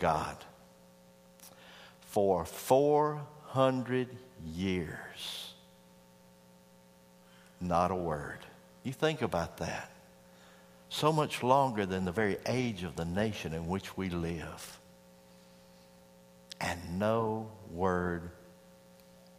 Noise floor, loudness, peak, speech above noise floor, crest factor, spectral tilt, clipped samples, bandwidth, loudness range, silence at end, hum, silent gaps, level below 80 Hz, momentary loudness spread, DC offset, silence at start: -60 dBFS; -33 LUFS; -10 dBFS; 28 dB; 24 dB; -5.5 dB/octave; under 0.1%; 15.5 kHz; 9 LU; 0.85 s; 60 Hz at -60 dBFS; none; -60 dBFS; 20 LU; under 0.1%; 0 s